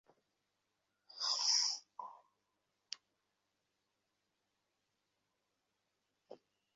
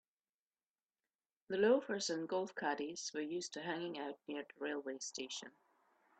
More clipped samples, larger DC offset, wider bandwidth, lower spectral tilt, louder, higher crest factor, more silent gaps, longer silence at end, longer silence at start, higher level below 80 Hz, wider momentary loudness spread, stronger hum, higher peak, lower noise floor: neither; neither; second, 7.6 kHz vs 9 kHz; second, 5 dB/octave vs -3 dB/octave; first, -34 LUFS vs -40 LUFS; about the same, 26 dB vs 22 dB; neither; second, 0.4 s vs 0.7 s; second, 1.15 s vs 1.5 s; about the same, under -90 dBFS vs -86 dBFS; first, 22 LU vs 13 LU; neither; about the same, -20 dBFS vs -20 dBFS; second, -86 dBFS vs under -90 dBFS